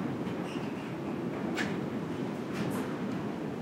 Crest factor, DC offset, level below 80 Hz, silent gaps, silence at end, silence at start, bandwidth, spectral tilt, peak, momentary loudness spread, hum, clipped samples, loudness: 16 dB; under 0.1%; -66 dBFS; none; 0 s; 0 s; 16 kHz; -6.5 dB/octave; -18 dBFS; 3 LU; none; under 0.1%; -35 LUFS